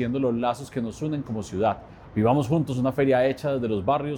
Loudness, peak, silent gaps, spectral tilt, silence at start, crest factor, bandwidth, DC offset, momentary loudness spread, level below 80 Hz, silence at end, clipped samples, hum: -25 LUFS; -8 dBFS; none; -7.5 dB/octave; 0 s; 16 dB; 17.5 kHz; under 0.1%; 9 LU; -52 dBFS; 0 s; under 0.1%; none